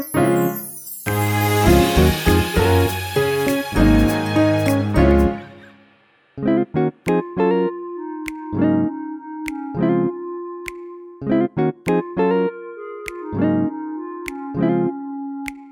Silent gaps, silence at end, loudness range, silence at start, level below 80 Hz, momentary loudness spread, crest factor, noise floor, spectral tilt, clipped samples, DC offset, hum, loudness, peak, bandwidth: none; 0 s; 6 LU; 0 s; -30 dBFS; 15 LU; 18 dB; -56 dBFS; -6 dB/octave; under 0.1%; under 0.1%; none; -19 LUFS; -2 dBFS; over 20 kHz